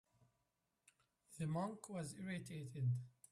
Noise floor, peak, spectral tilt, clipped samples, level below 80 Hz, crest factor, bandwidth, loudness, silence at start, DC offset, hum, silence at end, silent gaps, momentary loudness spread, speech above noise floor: -87 dBFS; -32 dBFS; -6.5 dB/octave; under 0.1%; -80 dBFS; 16 dB; 13.5 kHz; -46 LUFS; 1.3 s; under 0.1%; none; 0.2 s; none; 7 LU; 43 dB